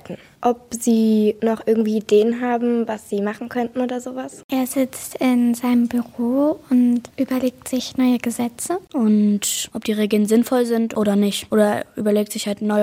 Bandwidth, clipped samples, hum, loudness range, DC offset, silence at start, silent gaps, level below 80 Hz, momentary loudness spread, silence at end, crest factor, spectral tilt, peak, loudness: 16.5 kHz; under 0.1%; none; 3 LU; under 0.1%; 0.05 s; 4.44-4.49 s; -62 dBFS; 8 LU; 0 s; 14 dB; -5 dB/octave; -4 dBFS; -20 LUFS